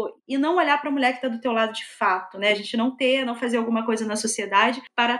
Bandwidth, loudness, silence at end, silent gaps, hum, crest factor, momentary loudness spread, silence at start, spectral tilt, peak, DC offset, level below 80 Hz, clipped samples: 12.5 kHz; -23 LUFS; 0 s; none; none; 18 dB; 5 LU; 0 s; -2.5 dB/octave; -6 dBFS; under 0.1%; -78 dBFS; under 0.1%